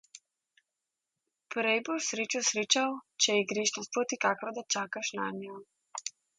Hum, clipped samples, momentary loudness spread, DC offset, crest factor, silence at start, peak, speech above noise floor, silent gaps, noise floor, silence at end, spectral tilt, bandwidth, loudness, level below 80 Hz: none; under 0.1%; 13 LU; under 0.1%; 24 dB; 0.15 s; -10 dBFS; 56 dB; none; -88 dBFS; 0.3 s; -1.5 dB/octave; 11 kHz; -30 LUFS; -84 dBFS